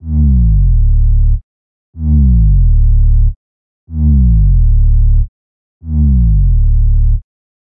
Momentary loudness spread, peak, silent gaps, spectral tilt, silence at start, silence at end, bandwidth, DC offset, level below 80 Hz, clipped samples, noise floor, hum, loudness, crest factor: 9 LU; -4 dBFS; 1.43-1.93 s, 3.36-3.87 s, 5.28-5.81 s; -16.5 dB/octave; 0.05 s; 0.5 s; 0.8 kHz; under 0.1%; -10 dBFS; under 0.1%; under -90 dBFS; none; -12 LUFS; 6 dB